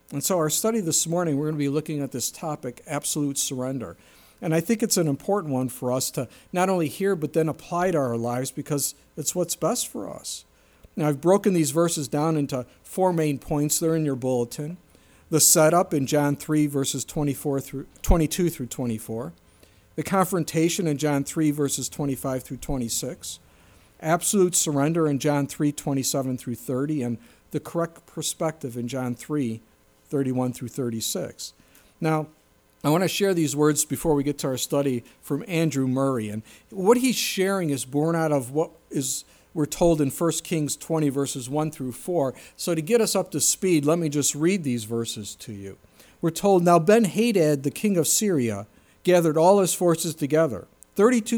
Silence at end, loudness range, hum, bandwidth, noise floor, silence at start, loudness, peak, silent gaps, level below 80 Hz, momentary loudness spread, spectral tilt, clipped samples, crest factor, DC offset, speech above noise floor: 0 s; 6 LU; none; over 20 kHz; -55 dBFS; 0.1 s; -24 LUFS; -4 dBFS; none; -44 dBFS; 12 LU; -4.5 dB/octave; under 0.1%; 20 dB; under 0.1%; 32 dB